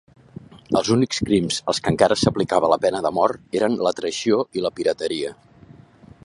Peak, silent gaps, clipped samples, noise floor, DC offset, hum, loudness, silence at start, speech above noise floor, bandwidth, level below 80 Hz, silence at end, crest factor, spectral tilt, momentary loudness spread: -2 dBFS; none; under 0.1%; -47 dBFS; under 0.1%; none; -21 LUFS; 0.55 s; 27 dB; 11.5 kHz; -50 dBFS; 0.9 s; 20 dB; -5 dB/octave; 6 LU